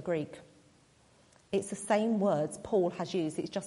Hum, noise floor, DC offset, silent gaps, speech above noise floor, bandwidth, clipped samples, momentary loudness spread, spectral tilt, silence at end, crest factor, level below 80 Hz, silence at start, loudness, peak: none; -64 dBFS; under 0.1%; none; 32 dB; 11.5 kHz; under 0.1%; 7 LU; -5.5 dB/octave; 0 s; 18 dB; -70 dBFS; 0 s; -32 LUFS; -16 dBFS